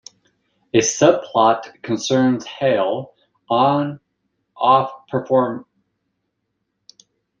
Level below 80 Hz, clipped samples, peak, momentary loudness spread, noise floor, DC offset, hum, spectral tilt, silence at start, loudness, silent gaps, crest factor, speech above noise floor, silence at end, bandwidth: -64 dBFS; under 0.1%; -2 dBFS; 11 LU; -74 dBFS; under 0.1%; none; -4.5 dB/octave; 0.75 s; -18 LUFS; none; 18 dB; 57 dB; 1.8 s; 9.4 kHz